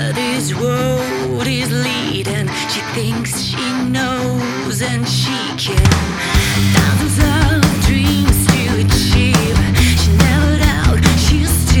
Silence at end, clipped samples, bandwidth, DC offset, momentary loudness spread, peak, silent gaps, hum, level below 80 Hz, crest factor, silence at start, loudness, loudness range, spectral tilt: 0 s; under 0.1%; 19 kHz; under 0.1%; 6 LU; 0 dBFS; none; none; -22 dBFS; 14 dB; 0 s; -14 LUFS; 5 LU; -4.5 dB/octave